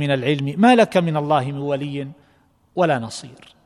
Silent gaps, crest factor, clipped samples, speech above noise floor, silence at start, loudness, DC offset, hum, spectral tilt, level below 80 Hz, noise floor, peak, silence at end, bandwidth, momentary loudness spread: none; 18 dB; under 0.1%; 39 dB; 0 s; -19 LUFS; under 0.1%; none; -6.5 dB/octave; -62 dBFS; -58 dBFS; -2 dBFS; 0.3 s; 12 kHz; 17 LU